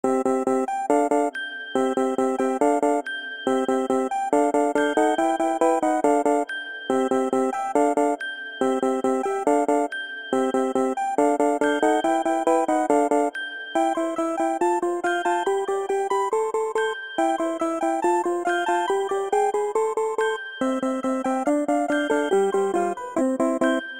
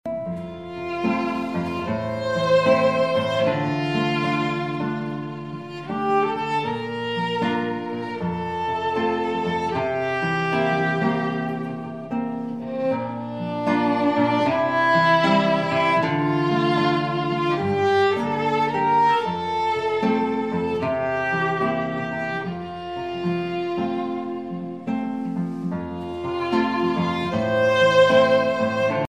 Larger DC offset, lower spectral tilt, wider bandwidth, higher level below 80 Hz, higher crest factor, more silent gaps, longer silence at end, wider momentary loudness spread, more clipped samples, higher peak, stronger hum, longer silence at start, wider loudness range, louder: about the same, 0.1% vs 0.2%; second, -4 dB/octave vs -6.5 dB/octave; first, 16 kHz vs 10 kHz; second, -68 dBFS vs -58 dBFS; about the same, 16 dB vs 18 dB; neither; about the same, 0 s vs 0.05 s; second, 5 LU vs 11 LU; neither; about the same, -6 dBFS vs -6 dBFS; neither; about the same, 0.05 s vs 0.05 s; second, 2 LU vs 6 LU; about the same, -23 LUFS vs -22 LUFS